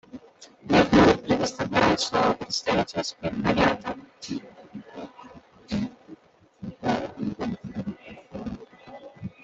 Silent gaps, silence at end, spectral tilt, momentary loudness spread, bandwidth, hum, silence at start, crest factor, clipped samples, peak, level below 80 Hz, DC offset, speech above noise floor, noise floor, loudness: none; 0.15 s; -5 dB/octave; 23 LU; 8.2 kHz; none; 0.15 s; 22 dB; under 0.1%; -4 dBFS; -50 dBFS; under 0.1%; 27 dB; -52 dBFS; -25 LUFS